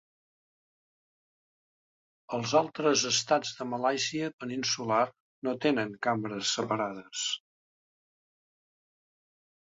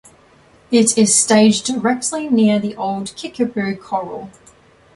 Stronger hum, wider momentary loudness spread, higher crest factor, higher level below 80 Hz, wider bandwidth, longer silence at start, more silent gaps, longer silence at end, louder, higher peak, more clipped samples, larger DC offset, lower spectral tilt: neither; second, 9 LU vs 13 LU; about the same, 20 dB vs 16 dB; second, -74 dBFS vs -58 dBFS; second, 7.8 kHz vs 11.5 kHz; first, 2.3 s vs 0.7 s; first, 4.33-4.38 s, 5.20-5.42 s vs none; first, 2.25 s vs 0.65 s; second, -30 LUFS vs -16 LUFS; second, -12 dBFS vs -2 dBFS; neither; neither; about the same, -3 dB/octave vs -3.5 dB/octave